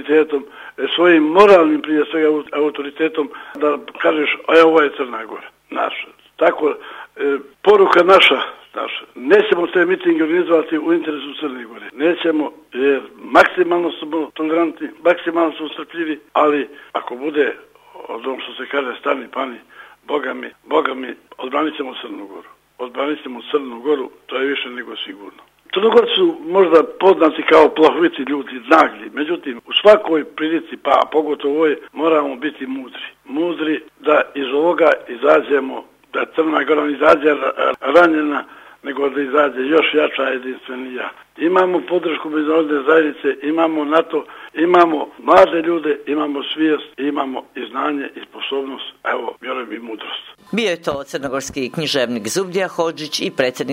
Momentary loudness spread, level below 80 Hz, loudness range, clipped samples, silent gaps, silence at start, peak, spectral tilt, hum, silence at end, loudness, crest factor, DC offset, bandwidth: 15 LU; -60 dBFS; 9 LU; under 0.1%; none; 0 s; 0 dBFS; -4.5 dB/octave; none; 0 s; -17 LUFS; 16 dB; under 0.1%; 15.5 kHz